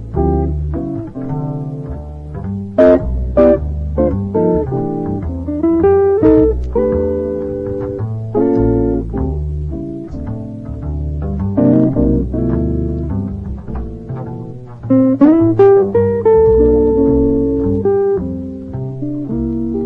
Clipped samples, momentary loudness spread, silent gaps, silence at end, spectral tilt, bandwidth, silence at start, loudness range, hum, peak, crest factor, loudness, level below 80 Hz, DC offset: under 0.1%; 15 LU; none; 0 s; -11.5 dB/octave; 4.1 kHz; 0 s; 7 LU; none; 0 dBFS; 14 dB; -15 LUFS; -26 dBFS; under 0.1%